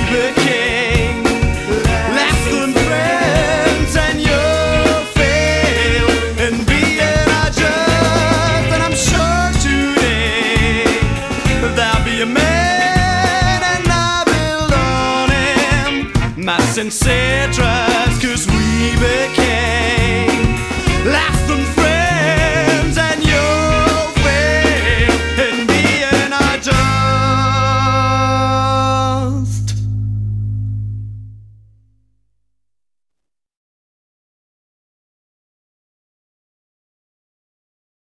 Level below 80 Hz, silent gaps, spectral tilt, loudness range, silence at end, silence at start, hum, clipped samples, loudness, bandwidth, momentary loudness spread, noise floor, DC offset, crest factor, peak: -24 dBFS; none; -4.5 dB/octave; 3 LU; 6.75 s; 0 s; none; under 0.1%; -14 LUFS; 11 kHz; 4 LU; -81 dBFS; 0.1%; 14 dB; 0 dBFS